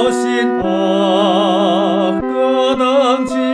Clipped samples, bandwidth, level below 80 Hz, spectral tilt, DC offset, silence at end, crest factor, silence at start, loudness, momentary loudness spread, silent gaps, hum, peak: under 0.1%; 11 kHz; -48 dBFS; -5.5 dB/octave; under 0.1%; 0 s; 12 dB; 0 s; -14 LUFS; 3 LU; none; none; -2 dBFS